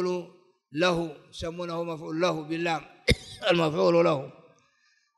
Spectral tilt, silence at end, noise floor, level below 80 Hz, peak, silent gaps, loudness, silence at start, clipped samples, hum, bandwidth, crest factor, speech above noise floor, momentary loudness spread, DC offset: -5.5 dB/octave; 0.85 s; -68 dBFS; -46 dBFS; -6 dBFS; none; -27 LUFS; 0 s; under 0.1%; none; 12 kHz; 22 dB; 41 dB; 14 LU; under 0.1%